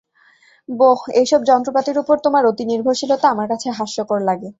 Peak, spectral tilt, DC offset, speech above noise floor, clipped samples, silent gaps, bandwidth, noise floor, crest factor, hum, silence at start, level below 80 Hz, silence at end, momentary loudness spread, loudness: -2 dBFS; -4.5 dB/octave; under 0.1%; 37 dB; under 0.1%; none; 8 kHz; -53 dBFS; 16 dB; none; 0.7 s; -64 dBFS; 0.1 s; 8 LU; -17 LUFS